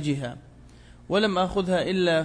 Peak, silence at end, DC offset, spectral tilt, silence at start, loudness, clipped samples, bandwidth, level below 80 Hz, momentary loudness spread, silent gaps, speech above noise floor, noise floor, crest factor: -10 dBFS; 0 s; under 0.1%; -6 dB/octave; 0 s; -25 LUFS; under 0.1%; 10.5 kHz; -50 dBFS; 12 LU; none; 25 dB; -49 dBFS; 16 dB